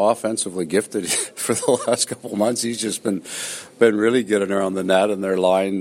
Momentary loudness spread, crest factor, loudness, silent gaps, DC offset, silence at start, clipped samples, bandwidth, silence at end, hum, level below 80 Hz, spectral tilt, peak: 6 LU; 18 dB; -20 LUFS; none; under 0.1%; 0 s; under 0.1%; 16 kHz; 0 s; none; -66 dBFS; -3.5 dB/octave; -2 dBFS